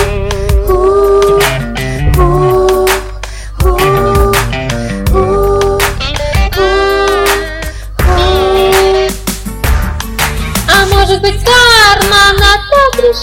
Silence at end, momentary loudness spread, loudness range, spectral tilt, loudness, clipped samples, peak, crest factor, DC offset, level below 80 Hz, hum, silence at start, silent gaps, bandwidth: 0 s; 10 LU; 4 LU; -4 dB/octave; -9 LUFS; 0.3%; 0 dBFS; 10 dB; under 0.1%; -16 dBFS; none; 0 s; none; 17 kHz